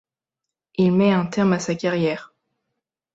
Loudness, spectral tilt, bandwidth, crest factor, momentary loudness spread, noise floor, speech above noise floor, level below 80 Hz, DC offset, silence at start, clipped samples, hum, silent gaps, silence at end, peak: -20 LUFS; -6.5 dB/octave; 7.8 kHz; 16 dB; 10 LU; -86 dBFS; 66 dB; -60 dBFS; under 0.1%; 0.8 s; under 0.1%; none; none; 0.9 s; -6 dBFS